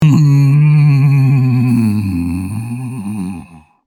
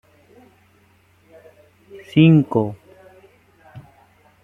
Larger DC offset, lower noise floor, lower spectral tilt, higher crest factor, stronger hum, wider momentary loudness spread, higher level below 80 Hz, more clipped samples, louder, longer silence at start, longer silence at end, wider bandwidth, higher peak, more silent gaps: neither; second, -35 dBFS vs -56 dBFS; about the same, -8.5 dB/octave vs -9.5 dB/octave; second, 12 dB vs 20 dB; neither; second, 13 LU vs 16 LU; first, -46 dBFS vs -58 dBFS; neither; first, -12 LUFS vs -16 LUFS; second, 0 s vs 1.95 s; second, 0.3 s vs 0.65 s; first, 12 kHz vs 3.9 kHz; about the same, 0 dBFS vs -2 dBFS; neither